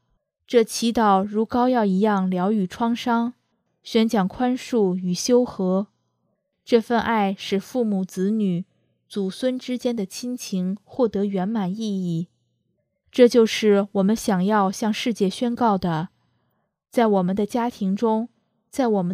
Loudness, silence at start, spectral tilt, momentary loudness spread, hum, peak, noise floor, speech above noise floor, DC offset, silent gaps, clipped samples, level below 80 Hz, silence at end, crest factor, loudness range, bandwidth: -22 LUFS; 0.5 s; -6 dB/octave; 9 LU; none; -2 dBFS; -73 dBFS; 52 dB; under 0.1%; none; under 0.1%; -58 dBFS; 0 s; 20 dB; 5 LU; 15 kHz